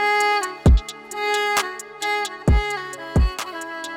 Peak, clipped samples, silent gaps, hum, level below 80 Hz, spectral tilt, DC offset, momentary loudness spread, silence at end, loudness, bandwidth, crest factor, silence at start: -8 dBFS; under 0.1%; none; none; -24 dBFS; -4.5 dB/octave; under 0.1%; 11 LU; 0 s; -22 LUFS; 17 kHz; 12 dB; 0 s